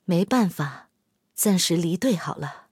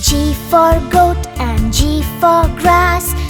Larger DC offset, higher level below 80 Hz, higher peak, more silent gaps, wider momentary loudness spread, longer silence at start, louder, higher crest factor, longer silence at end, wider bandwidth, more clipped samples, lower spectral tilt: neither; second, -68 dBFS vs -20 dBFS; second, -10 dBFS vs 0 dBFS; neither; first, 11 LU vs 5 LU; about the same, 0.1 s vs 0 s; second, -23 LUFS vs -13 LUFS; about the same, 16 dB vs 12 dB; first, 0.15 s vs 0 s; second, 16.5 kHz vs over 20 kHz; neither; about the same, -4.5 dB/octave vs -4.5 dB/octave